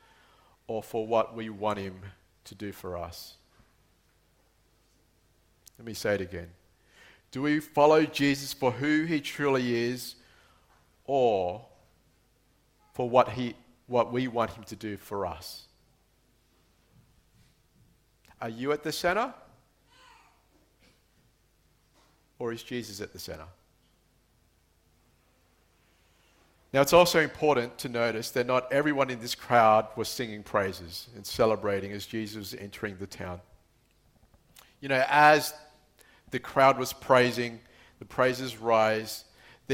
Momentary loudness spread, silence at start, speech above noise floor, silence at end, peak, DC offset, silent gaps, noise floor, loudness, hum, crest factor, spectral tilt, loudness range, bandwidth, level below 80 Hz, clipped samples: 19 LU; 0.7 s; 39 dB; 0 s; -6 dBFS; under 0.1%; none; -67 dBFS; -28 LUFS; none; 24 dB; -4.5 dB/octave; 16 LU; 16.5 kHz; -62 dBFS; under 0.1%